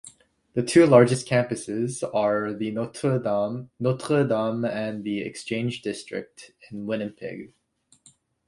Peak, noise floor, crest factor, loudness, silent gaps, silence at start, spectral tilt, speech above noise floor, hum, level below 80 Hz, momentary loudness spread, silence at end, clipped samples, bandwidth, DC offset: -2 dBFS; -64 dBFS; 22 dB; -24 LUFS; none; 0.05 s; -6 dB/octave; 40 dB; none; -64 dBFS; 17 LU; 1 s; under 0.1%; 11.5 kHz; under 0.1%